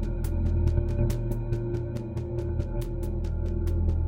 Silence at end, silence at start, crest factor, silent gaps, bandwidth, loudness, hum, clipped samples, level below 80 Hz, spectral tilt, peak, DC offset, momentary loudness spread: 0 s; 0 s; 14 dB; none; 16.5 kHz; -30 LUFS; none; under 0.1%; -30 dBFS; -9 dB/octave; -12 dBFS; under 0.1%; 6 LU